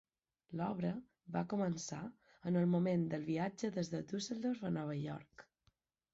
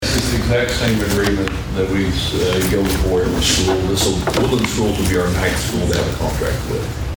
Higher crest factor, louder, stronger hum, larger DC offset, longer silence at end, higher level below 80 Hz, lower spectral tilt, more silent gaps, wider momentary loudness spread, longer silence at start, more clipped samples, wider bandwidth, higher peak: about the same, 14 dB vs 16 dB; second, -40 LUFS vs -17 LUFS; neither; neither; first, 0.7 s vs 0 s; second, -74 dBFS vs -26 dBFS; first, -7 dB/octave vs -4.5 dB/octave; neither; first, 14 LU vs 5 LU; first, 0.5 s vs 0 s; neither; second, 8 kHz vs over 20 kHz; second, -26 dBFS vs -2 dBFS